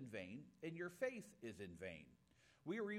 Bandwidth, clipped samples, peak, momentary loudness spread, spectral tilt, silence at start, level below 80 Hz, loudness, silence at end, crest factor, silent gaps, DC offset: 16 kHz; under 0.1%; -32 dBFS; 11 LU; -6 dB/octave; 0 s; -82 dBFS; -51 LUFS; 0 s; 20 dB; none; under 0.1%